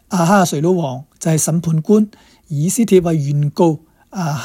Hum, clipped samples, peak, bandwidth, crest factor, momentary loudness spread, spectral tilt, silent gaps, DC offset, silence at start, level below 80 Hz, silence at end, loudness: none; under 0.1%; 0 dBFS; 16.5 kHz; 16 dB; 11 LU; -6 dB/octave; none; under 0.1%; 0.1 s; -52 dBFS; 0 s; -16 LUFS